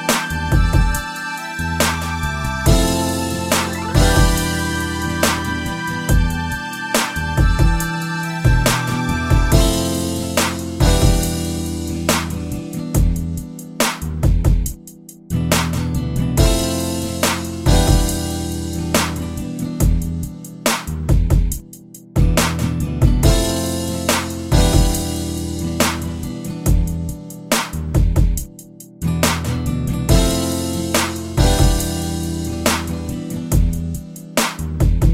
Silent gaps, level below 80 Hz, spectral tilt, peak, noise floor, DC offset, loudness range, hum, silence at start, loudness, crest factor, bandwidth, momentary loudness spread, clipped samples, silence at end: none; -22 dBFS; -4.5 dB/octave; 0 dBFS; -39 dBFS; under 0.1%; 3 LU; none; 0 s; -19 LUFS; 18 dB; 16.5 kHz; 10 LU; under 0.1%; 0 s